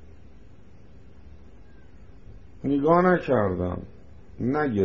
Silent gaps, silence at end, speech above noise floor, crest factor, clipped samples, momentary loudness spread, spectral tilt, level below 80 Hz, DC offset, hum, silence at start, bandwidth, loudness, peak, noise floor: none; 0 s; 29 dB; 20 dB; under 0.1%; 15 LU; -7.5 dB/octave; -52 dBFS; 0.5%; none; 2.25 s; 6.8 kHz; -24 LUFS; -6 dBFS; -51 dBFS